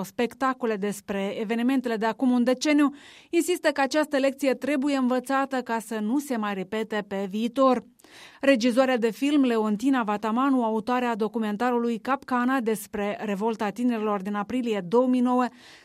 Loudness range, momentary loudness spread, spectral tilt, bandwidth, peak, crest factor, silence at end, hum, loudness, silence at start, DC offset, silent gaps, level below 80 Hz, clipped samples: 3 LU; 7 LU; -5 dB/octave; 15 kHz; -6 dBFS; 18 dB; 0.1 s; none; -25 LUFS; 0 s; under 0.1%; none; -68 dBFS; under 0.1%